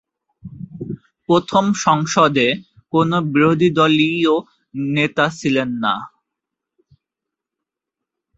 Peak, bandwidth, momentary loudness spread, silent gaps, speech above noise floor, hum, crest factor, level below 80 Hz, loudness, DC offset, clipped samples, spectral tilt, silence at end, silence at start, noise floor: -2 dBFS; 8 kHz; 17 LU; none; 68 dB; none; 18 dB; -56 dBFS; -17 LUFS; under 0.1%; under 0.1%; -5.5 dB/octave; 2.3 s; 0.45 s; -84 dBFS